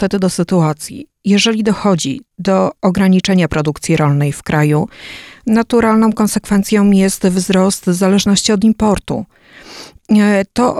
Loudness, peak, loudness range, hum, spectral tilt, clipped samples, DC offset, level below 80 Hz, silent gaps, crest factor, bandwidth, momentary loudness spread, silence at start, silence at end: -13 LUFS; 0 dBFS; 2 LU; none; -5.5 dB/octave; under 0.1%; under 0.1%; -40 dBFS; none; 14 dB; 14 kHz; 12 LU; 0 s; 0 s